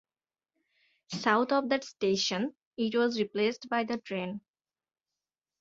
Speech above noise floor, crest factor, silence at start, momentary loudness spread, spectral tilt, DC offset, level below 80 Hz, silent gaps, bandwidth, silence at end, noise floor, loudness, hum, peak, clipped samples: over 60 dB; 22 dB; 1.1 s; 9 LU; -4 dB/octave; under 0.1%; -76 dBFS; 2.66-2.71 s; 7.8 kHz; 1.2 s; under -90 dBFS; -30 LUFS; none; -12 dBFS; under 0.1%